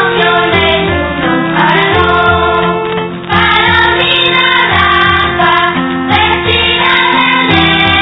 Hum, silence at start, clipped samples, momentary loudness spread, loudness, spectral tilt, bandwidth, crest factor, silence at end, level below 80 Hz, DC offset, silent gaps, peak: none; 0 s; 0.5%; 5 LU; -8 LUFS; -7 dB/octave; 5.4 kHz; 10 dB; 0 s; -30 dBFS; under 0.1%; none; 0 dBFS